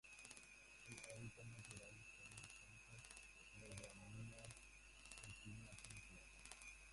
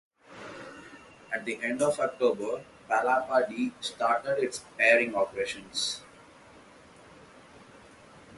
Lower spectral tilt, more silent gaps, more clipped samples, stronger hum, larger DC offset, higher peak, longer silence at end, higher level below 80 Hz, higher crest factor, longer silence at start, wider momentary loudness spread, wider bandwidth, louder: about the same, -3 dB/octave vs -3 dB/octave; neither; neither; neither; neither; second, -32 dBFS vs -8 dBFS; about the same, 0 s vs 0 s; about the same, -70 dBFS vs -70 dBFS; first, 28 dB vs 22 dB; second, 0.05 s vs 0.3 s; second, 4 LU vs 20 LU; about the same, 11.5 kHz vs 11.5 kHz; second, -58 LUFS vs -28 LUFS